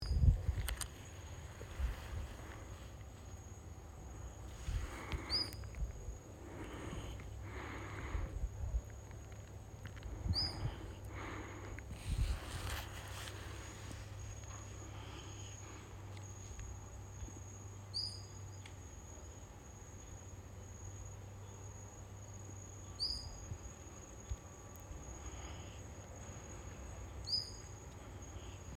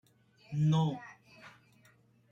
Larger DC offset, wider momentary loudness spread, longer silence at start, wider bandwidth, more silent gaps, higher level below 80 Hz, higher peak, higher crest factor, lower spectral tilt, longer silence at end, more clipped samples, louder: neither; second, 13 LU vs 26 LU; second, 0 s vs 0.5 s; first, 16.5 kHz vs 7.2 kHz; neither; first, -48 dBFS vs -70 dBFS; about the same, -18 dBFS vs -20 dBFS; first, 26 dB vs 16 dB; second, -4 dB/octave vs -7.5 dB/octave; second, 0 s vs 0.8 s; neither; second, -46 LUFS vs -32 LUFS